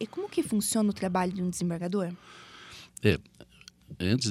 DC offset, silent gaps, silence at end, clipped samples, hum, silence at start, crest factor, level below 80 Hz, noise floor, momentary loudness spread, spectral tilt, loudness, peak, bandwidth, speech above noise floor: under 0.1%; none; 0 s; under 0.1%; none; 0 s; 22 dB; -56 dBFS; -50 dBFS; 19 LU; -5 dB/octave; -30 LUFS; -8 dBFS; 15.5 kHz; 21 dB